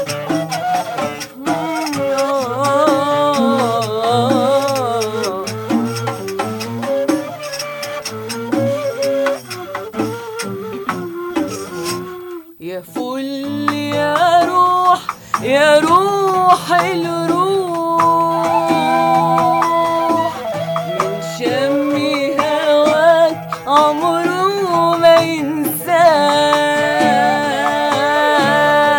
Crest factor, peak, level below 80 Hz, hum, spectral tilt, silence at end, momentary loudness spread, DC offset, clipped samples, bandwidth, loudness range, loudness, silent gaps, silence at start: 14 dB; 0 dBFS; -58 dBFS; none; -4.5 dB/octave; 0 s; 12 LU; under 0.1%; under 0.1%; 17 kHz; 8 LU; -15 LUFS; none; 0 s